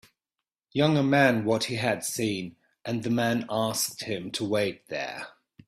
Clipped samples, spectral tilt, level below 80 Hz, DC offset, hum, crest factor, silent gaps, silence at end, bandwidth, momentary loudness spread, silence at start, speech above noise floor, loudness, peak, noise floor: under 0.1%; -4.5 dB/octave; -66 dBFS; under 0.1%; none; 20 dB; none; 0.4 s; 16 kHz; 13 LU; 0.75 s; 62 dB; -27 LUFS; -8 dBFS; -88 dBFS